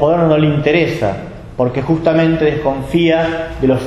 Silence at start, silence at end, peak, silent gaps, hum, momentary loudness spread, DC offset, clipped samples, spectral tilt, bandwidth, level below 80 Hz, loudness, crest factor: 0 s; 0 s; 0 dBFS; none; none; 7 LU; under 0.1%; under 0.1%; -8 dB/octave; 12 kHz; -36 dBFS; -14 LUFS; 14 dB